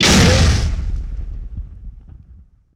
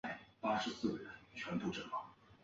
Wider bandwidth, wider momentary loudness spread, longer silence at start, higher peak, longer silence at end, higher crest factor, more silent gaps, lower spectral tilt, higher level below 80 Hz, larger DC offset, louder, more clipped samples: first, 16.5 kHz vs 7.6 kHz; first, 22 LU vs 10 LU; about the same, 0 s vs 0.05 s; first, -6 dBFS vs -24 dBFS; first, 0.4 s vs 0.1 s; second, 12 dB vs 18 dB; neither; about the same, -4 dB/octave vs -3.5 dB/octave; first, -22 dBFS vs -72 dBFS; neither; first, -15 LUFS vs -42 LUFS; neither